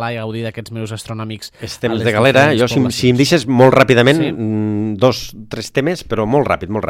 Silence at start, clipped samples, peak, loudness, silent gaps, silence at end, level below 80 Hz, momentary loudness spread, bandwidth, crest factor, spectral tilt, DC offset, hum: 0 s; under 0.1%; 0 dBFS; -14 LUFS; none; 0 s; -44 dBFS; 15 LU; 16 kHz; 14 dB; -5.5 dB/octave; under 0.1%; none